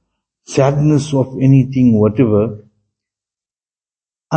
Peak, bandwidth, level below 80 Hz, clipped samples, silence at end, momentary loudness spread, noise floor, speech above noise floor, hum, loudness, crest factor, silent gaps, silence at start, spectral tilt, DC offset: 0 dBFS; 8.6 kHz; -48 dBFS; under 0.1%; 0 s; 6 LU; under -90 dBFS; over 78 dB; none; -14 LUFS; 14 dB; none; 0.5 s; -8 dB/octave; under 0.1%